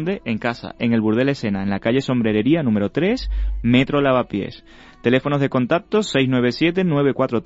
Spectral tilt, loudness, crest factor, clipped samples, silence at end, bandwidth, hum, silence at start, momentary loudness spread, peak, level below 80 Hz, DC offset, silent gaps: -7 dB/octave; -19 LUFS; 14 dB; under 0.1%; 0.05 s; 8 kHz; none; 0 s; 6 LU; -4 dBFS; -34 dBFS; under 0.1%; none